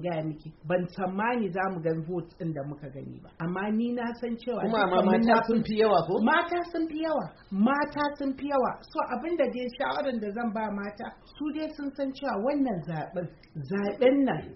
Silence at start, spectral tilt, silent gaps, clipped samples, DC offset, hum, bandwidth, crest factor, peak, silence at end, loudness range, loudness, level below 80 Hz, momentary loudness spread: 0 s; -5 dB/octave; none; under 0.1%; under 0.1%; none; 5.8 kHz; 18 dB; -10 dBFS; 0 s; 7 LU; -28 LUFS; -58 dBFS; 13 LU